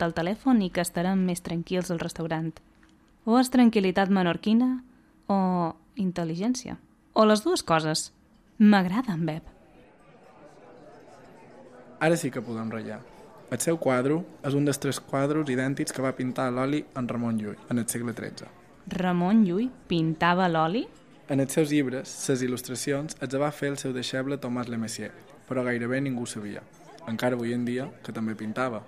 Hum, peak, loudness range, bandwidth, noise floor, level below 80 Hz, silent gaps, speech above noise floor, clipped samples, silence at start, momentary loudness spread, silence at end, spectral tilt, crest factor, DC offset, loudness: none; -8 dBFS; 6 LU; 14.5 kHz; -58 dBFS; -60 dBFS; none; 32 dB; under 0.1%; 0 s; 13 LU; 0 s; -5.5 dB/octave; 18 dB; under 0.1%; -27 LUFS